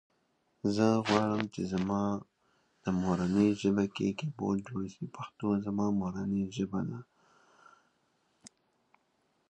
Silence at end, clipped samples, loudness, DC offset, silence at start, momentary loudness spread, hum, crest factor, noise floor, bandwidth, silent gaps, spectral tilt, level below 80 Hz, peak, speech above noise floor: 1 s; under 0.1%; -32 LUFS; under 0.1%; 0.65 s; 12 LU; none; 24 dB; -75 dBFS; 9.2 kHz; none; -7 dB/octave; -62 dBFS; -10 dBFS; 44 dB